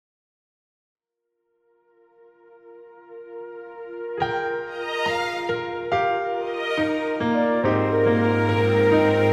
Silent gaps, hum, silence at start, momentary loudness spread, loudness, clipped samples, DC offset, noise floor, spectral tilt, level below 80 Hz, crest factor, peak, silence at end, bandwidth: none; none; 2.65 s; 19 LU; -22 LUFS; under 0.1%; under 0.1%; -79 dBFS; -7 dB/octave; -58 dBFS; 16 dB; -8 dBFS; 0 s; 11.5 kHz